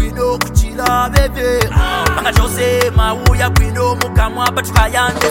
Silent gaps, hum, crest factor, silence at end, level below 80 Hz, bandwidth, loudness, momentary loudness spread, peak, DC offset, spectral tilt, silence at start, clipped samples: none; none; 12 dB; 0 s; -18 dBFS; 17 kHz; -14 LUFS; 3 LU; 0 dBFS; under 0.1%; -4.5 dB/octave; 0 s; under 0.1%